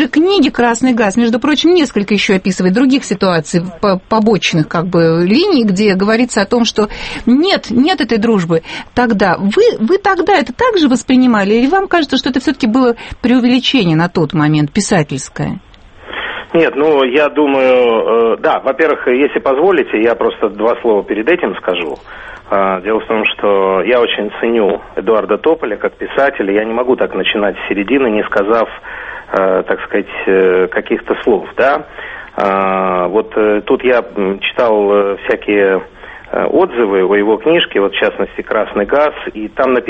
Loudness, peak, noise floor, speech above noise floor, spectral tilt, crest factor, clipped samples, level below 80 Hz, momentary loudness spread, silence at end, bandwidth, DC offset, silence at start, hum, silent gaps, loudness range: -12 LUFS; 0 dBFS; -32 dBFS; 20 dB; -5.5 dB/octave; 12 dB; under 0.1%; -42 dBFS; 7 LU; 0 s; 8.8 kHz; under 0.1%; 0 s; none; none; 3 LU